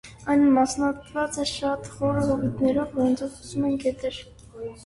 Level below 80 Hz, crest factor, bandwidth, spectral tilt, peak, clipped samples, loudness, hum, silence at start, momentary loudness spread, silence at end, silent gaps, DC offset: -50 dBFS; 16 dB; 11.5 kHz; -5.5 dB/octave; -10 dBFS; under 0.1%; -25 LUFS; none; 0.05 s; 12 LU; 0 s; none; under 0.1%